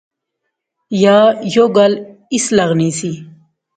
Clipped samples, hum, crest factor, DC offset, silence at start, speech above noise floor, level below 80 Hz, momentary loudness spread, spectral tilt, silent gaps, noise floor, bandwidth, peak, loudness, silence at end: under 0.1%; none; 14 dB; under 0.1%; 0.9 s; 62 dB; -58 dBFS; 13 LU; -5 dB/octave; none; -75 dBFS; 9.4 kHz; 0 dBFS; -13 LUFS; 0.5 s